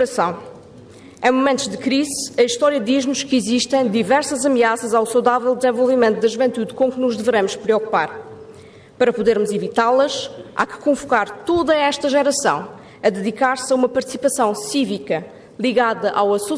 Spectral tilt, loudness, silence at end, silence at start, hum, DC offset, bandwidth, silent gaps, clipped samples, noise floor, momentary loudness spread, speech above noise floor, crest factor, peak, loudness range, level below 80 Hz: -3.5 dB/octave; -18 LUFS; 0 s; 0 s; none; under 0.1%; 11 kHz; none; under 0.1%; -42 dBFS; 7 LU; 24 dB; 16 dB; -4 dBFS; 3 LU; -58 dBFS